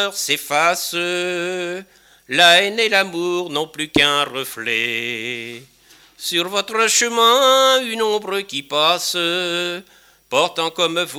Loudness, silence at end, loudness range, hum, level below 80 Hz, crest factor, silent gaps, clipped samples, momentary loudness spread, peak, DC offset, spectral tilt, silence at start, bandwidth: -17 LUFS; 0 s; 4 LU; none; -60 dBFS; 18 dB; none; under 0.1%; 12 LU; 0 dBFS; under 0.1%; -1.5 dB/octave; 0 s; 17.5 kHz